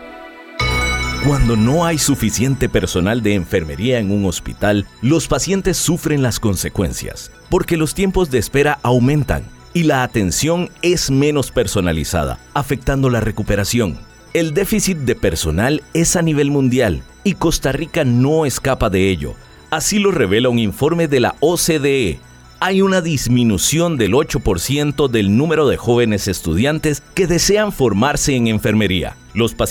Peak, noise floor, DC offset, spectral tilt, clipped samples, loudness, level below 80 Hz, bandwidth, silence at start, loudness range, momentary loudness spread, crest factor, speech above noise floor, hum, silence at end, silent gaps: -4 dBFS; -35 dBFS; under 0.1%; -5 dB/octave; under 0.1%; -16 LUFS; -32 dBFS; 19.5 kHz; 0 s; 2 LU; 6 LU; 12 dB; 19 dB; none; 0 s; none